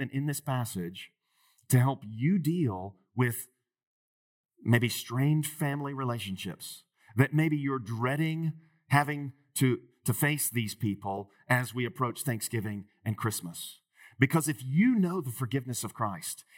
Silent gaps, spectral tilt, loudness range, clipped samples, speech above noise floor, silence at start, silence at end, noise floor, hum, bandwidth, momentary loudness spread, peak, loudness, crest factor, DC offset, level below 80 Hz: 3.87-4.44 s; -5.5 dB/octave; 2 LU; under 0.1%; 39 dB; 0 s; 0.15 s; -69 dBFS; none; 17.5 kHz; 13 LU; -8 dBFS; -30 LUFS; 24 dB; under 0.1%; -80 dBFS